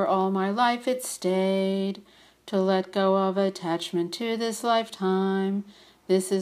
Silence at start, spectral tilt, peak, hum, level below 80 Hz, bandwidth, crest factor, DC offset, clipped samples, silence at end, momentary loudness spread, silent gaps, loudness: 0 s; -5.5 dB/octave; -10 dBFS; none; -74 dBFS; 15 kHz; 16 dB; under 0.1%; under 0.1%; 0 s; 6 LU; none; -26 LUFS